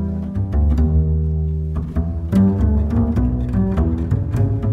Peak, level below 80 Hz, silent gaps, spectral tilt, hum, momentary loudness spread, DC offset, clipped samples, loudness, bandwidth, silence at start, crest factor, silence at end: -4 dBFS; -22 dBFS; none; -10.5 dB/octave; none; 7 LU; under 0.1%; under 0.1%; -19 LUFS; 3.7 kHz; 0 s; 12 dB; 0 s